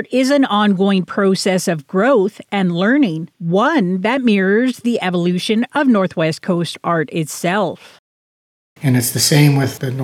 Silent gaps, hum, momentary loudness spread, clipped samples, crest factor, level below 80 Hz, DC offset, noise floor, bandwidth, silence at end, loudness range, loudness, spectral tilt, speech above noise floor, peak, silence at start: 7.99-8.76 s; none; 6 LU; under 0.1%; 14 dB; -66 dBFS; under 0.1%; under -90 dBFS; 17.5 kHz; 0 s; 3 LU; -16 LUFS; -5.5 dB/octave; over 75 dB; -2 dBFS; 0 s